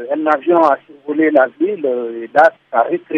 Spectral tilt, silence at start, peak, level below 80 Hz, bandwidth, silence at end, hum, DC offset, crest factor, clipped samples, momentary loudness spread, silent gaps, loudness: -7 dB/octave; 0 s; 0 dBFS; -68 dBFS; 6.8 kHz; 0 s; none; under 0.1%; 14 dB; under 0.1%; 7 LU; none; -15 LUFS